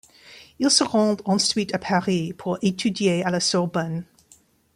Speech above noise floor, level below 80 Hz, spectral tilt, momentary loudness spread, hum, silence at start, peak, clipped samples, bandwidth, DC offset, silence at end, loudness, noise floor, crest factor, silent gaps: 35 dB; -62 dBFS; -4 dB/octave; 8 LU; none; 0.25 s; -4 dBFS; under 0.1%; 15 kHz; under 0.1%; 0.7 s; -22 LUFS; -57 dBFS; 20 dB; none